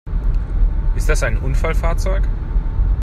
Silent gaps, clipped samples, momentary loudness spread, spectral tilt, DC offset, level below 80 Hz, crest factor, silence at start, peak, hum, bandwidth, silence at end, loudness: none; under 0.1%; 4 LU; -6 dB/octave; under 0.1%; -16 dBFS; 14 dB; 0.05 s; -2 dBFS; none; 12 kHz; 0 s; -21 LUFS